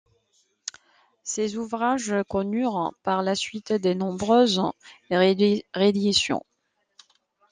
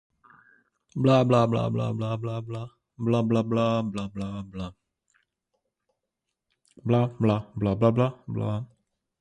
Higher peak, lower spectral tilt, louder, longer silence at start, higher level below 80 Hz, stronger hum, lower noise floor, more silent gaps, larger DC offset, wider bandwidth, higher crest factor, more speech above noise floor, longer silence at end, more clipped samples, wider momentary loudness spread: about the same, -6 dBFS vs -8 dBFS; second, -4.5 dB/octave vs -8.5 dB/octave; about the same, -24 LUFS vs -26 LUFS; first, 1.25 s vs 0.95 s; second, -62 dBFS vs -56 dBFS; neither; second, -68 dBFS vs -84 dBFS; neither; neither; about the same, 9.8 kHz vs 9.2 kHz; about the same, 18 dB vs 20 dB; second, 45 dB vs 59 dB; first, 1.1 s vs 0.55 s; neither; about the same, 13 LU vs 15 LU